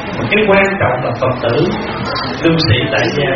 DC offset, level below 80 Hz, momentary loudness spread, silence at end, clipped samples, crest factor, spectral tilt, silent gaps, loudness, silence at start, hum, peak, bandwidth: under 0.1%; -36 dBFS; 8 LU; 0 s; under 0.1%; 14 dB; -4 dB/octave; none; -13 LUFS; 0 s; none; 0 dBFS; 7.2 kHz